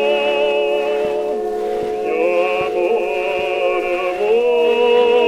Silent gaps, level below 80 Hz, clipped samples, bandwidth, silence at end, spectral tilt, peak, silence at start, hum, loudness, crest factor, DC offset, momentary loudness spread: none; -50 dBFS; under 0.1%; 13 kHz; 0 s; -4 dB/octave; -4 dBFS; 0 s; none; -17 LUFS; 12 dB; under 0.1%; 7 LU